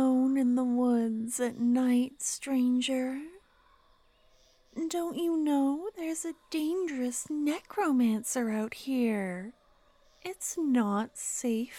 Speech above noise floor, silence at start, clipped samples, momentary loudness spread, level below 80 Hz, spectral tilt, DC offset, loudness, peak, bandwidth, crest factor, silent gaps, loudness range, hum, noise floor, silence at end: 34 dB; 0 s; under 0.1%; 10 LU; -70 dBFS; -4 dB/octave; under 0.1%; -30 LUFS; -18 dBFS; 15 kHz; 12 dB; none; 4 LU; none; -64 dBFS; 0 s